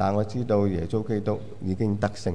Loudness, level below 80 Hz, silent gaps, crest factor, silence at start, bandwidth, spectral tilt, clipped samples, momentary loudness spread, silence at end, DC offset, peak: -27 LUFS; -50 dBFS; none; 16 dB; 0 s; 10.5 kHz; -8 dB/octave; under 0.1%; 7 LU; 0 s; 1%; -10 dBFS